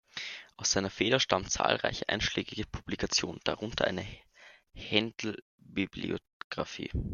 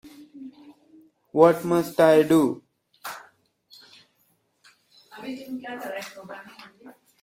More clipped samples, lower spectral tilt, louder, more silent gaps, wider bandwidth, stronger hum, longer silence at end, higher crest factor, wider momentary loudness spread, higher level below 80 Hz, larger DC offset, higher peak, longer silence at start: neither; second, -3 dB/octave vs -6 dB/octave; second, -32 LUFS vs -22 LUFS; first, 5.42-5.58 s, 6.33-6.50 s vs none; second, 11 kHz vs 16.5 kHz; neither; second, 0 s vs 0.8 s; about the same, 26 dB vs 24 dB; second, 12 LU vs 26 LU; first, -50 dBFS vs -68 dBFS; neither; second, -8 dBFS vs -2 dBFS; about the same, 0.15 s vs 0.05 s